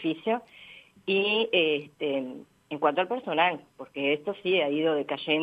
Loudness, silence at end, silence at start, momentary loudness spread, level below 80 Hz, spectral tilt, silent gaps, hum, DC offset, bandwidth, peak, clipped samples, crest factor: -27 LUFS; 0 s; 0 s; 16 LU; -78 dBFS; -6.5 dB/octave; none; none; under 0.1%; 8.4 kHz; -8 dBFS; under 0.1%; 20 dB